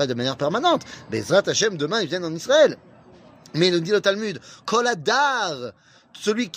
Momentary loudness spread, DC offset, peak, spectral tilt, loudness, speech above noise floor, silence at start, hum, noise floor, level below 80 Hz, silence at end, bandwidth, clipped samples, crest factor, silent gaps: 12 LU; under 0.1%; -4 dBFS; -3.5 dB/octave; -21 LUFS; 27 dB; 0 s; none; -49 dBFS; -66 dBFS; 0 s; 15.5 kHz; under 0.1%; 18 dB; none